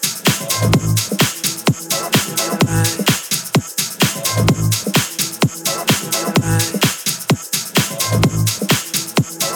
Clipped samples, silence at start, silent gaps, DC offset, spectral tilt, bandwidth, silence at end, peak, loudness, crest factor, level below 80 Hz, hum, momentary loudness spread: under 0.1%; 0 s; none; under 0.1%; -3.5 dB/octave; over 20 kHz; 0 s; -2 dBFS; -16 LUFS; 14 dB; -40 dBFS; none; 3 LU